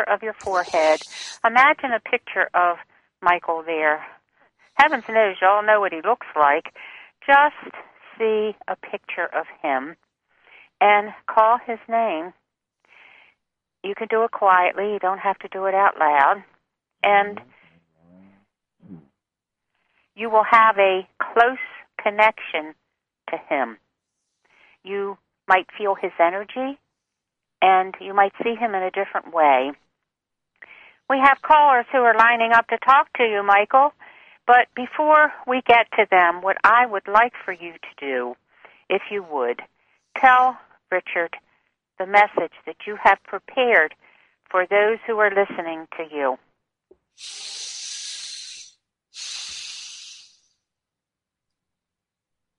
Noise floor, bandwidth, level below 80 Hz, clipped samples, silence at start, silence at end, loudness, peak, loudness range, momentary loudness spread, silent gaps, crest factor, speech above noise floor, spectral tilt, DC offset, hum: -86 dBFS; 11 kHz; -66 dBFS; under 0.1%; 0 s; 2.45 s; -19 LUFS; -2 dBFS; 11 LU; 17 LU; none; 20 dB; 67 dB; -3 dB/octave; under 0.1%; none